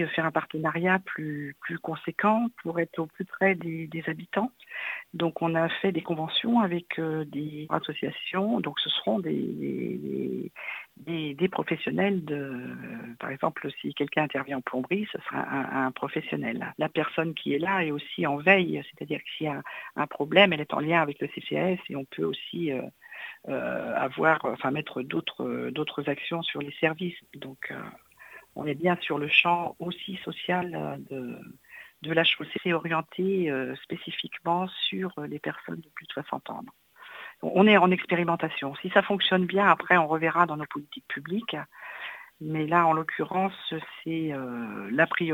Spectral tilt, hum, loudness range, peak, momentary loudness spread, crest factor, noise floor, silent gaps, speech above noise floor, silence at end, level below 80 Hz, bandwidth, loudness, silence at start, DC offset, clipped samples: -7 dB/octave; none; 6 LU; -4 dBFS; 15 LU; 26 dB; -51 dBFS; none; 23 dB; 0 s; -72 dBFS; 17 kHz; -28 LUFS; 0 s; under 0.1%; under 0.1%